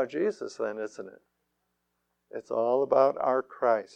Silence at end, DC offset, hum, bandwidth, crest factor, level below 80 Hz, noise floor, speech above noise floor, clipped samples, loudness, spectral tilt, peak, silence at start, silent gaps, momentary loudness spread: 0.1 s; under 0.1%; 60 Hz at -75 dBFS; 9 kHz; 18 dB; -74 dBFS; -79 dBFS; 51 dB; under 0.1%; -28 LUFS; -6 dB/octave; -10 dBFS; 0 s; none; 19 LU